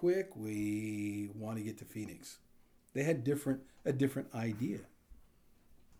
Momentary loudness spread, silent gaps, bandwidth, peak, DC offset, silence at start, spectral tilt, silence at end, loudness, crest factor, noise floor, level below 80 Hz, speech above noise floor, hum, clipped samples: 11 LU; none; over 20 kHz; -20 dBFS; under 0.1%; 0 s; -7 dB/octave; 0.05 s; -38 LUFS; 18 dB; -64 dBFS; -68 dBFS; 27 dB; none; under 0.1%